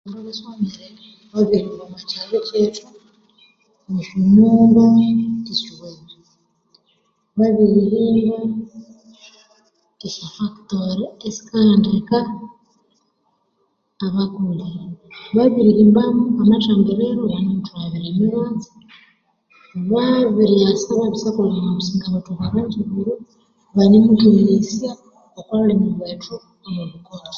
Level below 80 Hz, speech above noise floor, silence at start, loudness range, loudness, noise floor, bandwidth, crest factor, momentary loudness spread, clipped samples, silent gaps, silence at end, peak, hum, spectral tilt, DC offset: -54 dBFS; 50 dB; 0.05 s; 7 LU; -17 LUFS; -67 dBFS; 7 kHz; 16 dB; 19 LU; under 0.1%; none; 0 s; -2 dBFS; none; -7.5 dB/octave; under 0.1%